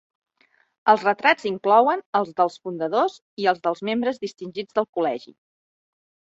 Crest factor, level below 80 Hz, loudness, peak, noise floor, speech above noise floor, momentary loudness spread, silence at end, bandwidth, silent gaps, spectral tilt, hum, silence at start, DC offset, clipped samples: 20 dB; -74 dBFS; -22 LUFS; -2 dBFS; -64 dBFS; 42 dB; 10 LU; 1.2 s; 8 kHz; 2.06-2.13 s, 3.22-3.37 s, 4.89-4.93 s; -5 dB/octave; none; 0.85 s; under 0.1%; under 0.1%